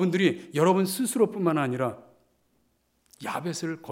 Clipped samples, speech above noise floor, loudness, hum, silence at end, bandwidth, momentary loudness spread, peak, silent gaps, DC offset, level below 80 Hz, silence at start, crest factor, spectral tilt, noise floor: under 0.1%; 44 dB; -26 LUFS; none; 0 s; 16.5 kHz; 11 LU; -8 dBFS; none; under 0.1%; -76 dBFS; 0 s; 18 dB; -5.5 dB/octave; -70 dBFS